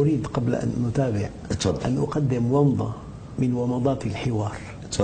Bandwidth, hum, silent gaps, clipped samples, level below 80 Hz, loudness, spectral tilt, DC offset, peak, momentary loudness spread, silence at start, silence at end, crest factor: 9.4 kHz; none; none; under 0.1%; -44 dBFS; -25 LUFS; -7 dB/octave; under 0.1%; -6 dBFS; 10 LU; 0 s; 0 s; 18 dB